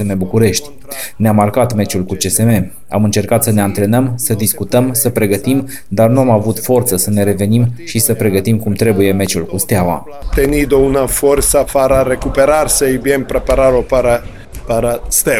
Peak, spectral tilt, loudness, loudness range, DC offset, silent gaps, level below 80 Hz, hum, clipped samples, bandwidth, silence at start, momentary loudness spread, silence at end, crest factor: 0 dBFS; -5 dB/octave; -13 LUFS; 2 LU; 3%; none; -28 dBFS; none; under 0.1%; 17 kHz; 0 s; 5 LU; 0 s; 12 dB